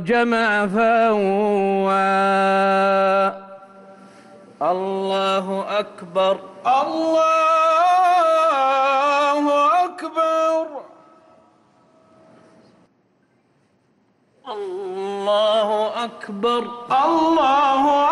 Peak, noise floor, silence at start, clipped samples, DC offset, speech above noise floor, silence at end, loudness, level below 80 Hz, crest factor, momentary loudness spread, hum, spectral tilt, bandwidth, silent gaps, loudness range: -10 dBFS; -62 dBFS; 0 s; under 0.1%; under 0.1%; 43 dB; 0 s; -18 LUFS; -64 dBFS; 10 dB; 9 LU; none; -5 dB/octave; 12 kHz; none; 10 LU